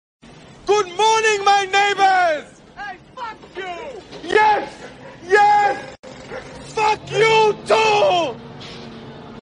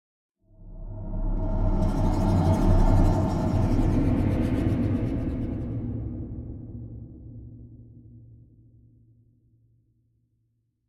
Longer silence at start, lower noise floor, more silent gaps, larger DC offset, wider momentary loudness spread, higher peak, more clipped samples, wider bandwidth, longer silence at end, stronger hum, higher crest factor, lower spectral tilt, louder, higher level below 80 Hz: about the same, 0.65 s vs 0.6 s; second, -39 dBFS vs -72 dBFS; first, 5.99-6.03 s vs none; neither; about the same, 21 LU vs 21 LU; first, -2 dBFS vs -8 dBFS; neither; first, 10 kHz vs 8.8 kHz; second, 0.05 s vs 2.55 s; neither; about the same, 16 dB vs 18 dB; second, -2.5 dB/octave vs -9 dB/octave; first, -16 LUFS vs -26 LUFS; second, -54 dBFS vs -30 dBFS